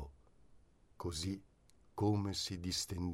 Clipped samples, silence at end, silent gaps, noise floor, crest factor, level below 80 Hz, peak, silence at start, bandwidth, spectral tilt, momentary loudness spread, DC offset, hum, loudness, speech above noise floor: under 0.1%; 0 s; none; -65 dBFS; 18 dB; -58 dBFS; -24 dBFS; 0 s; 16 kHz; -5 dB/octave; 13 LU; under 0.1%; none; -39 LUFS; 27 dB